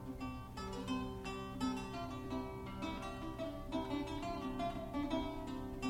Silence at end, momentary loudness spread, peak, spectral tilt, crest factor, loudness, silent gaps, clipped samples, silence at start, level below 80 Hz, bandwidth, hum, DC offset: 0 s; 5 LU; -26 dBFS; -6 dB/octave; 16 dB; -43 LUFS; none; under 0.1%; 0 s; -54 dBFS; 16.5 kHz; none; under 0.1%